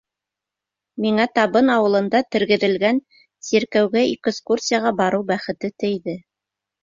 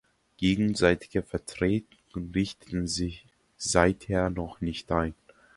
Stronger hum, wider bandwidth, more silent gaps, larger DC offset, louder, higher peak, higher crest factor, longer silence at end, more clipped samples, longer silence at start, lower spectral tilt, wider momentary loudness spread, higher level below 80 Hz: neither; second, 7.6 kHz vs 11.5 kHz; neither; neither; first, -19 LUFS vs -28 LUFS; about the same, -2 dBFS vs -4 dBFS; second, 18 dB vs 24 dB; first, 0.65 s vs 0.45 s; neither; first, 0.95 s vs 0.4 s; about the same, -4.5 dB/octave vs -5 dB/octave; about the same, 10 LU vs 11 LU; second, -62 dBFS vs -46 dBFS